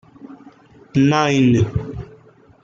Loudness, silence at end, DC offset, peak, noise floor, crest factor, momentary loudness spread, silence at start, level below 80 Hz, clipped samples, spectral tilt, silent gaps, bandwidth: -17 LUFS; 0.6 s; under 0.1%; -4 dBFS; -48 dBFS; 16 dB; 19 LU; 0.25 s; -44 dBFS; under 0.1%; -6.5 dB/octave; none; 7.6 kHz